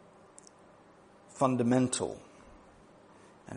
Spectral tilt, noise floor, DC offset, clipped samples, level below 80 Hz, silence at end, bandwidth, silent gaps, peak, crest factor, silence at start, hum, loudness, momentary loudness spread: -5.5 dB/octave; -58 dBFS; under 0.1%; under 0.1%; -68 dBFS; 0 s; 10.5 kHz; none; -12 dBFS; 22 dB; 1.35 s; none; -30 LUFS; 27 LU